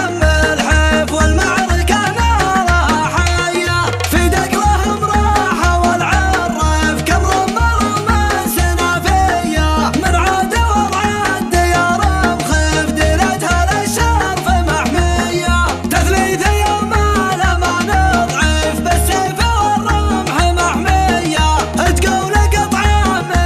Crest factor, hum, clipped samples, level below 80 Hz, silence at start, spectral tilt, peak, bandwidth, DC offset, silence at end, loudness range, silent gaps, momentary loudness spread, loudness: 14 dB; none; under 0.1%; -20 dBFS; 0 s; -4.5 dB/octave; 0 dBFS; 15 kHz; under 0.1%; 0 s; 1 LU; none; 2 LU; -14 LUFS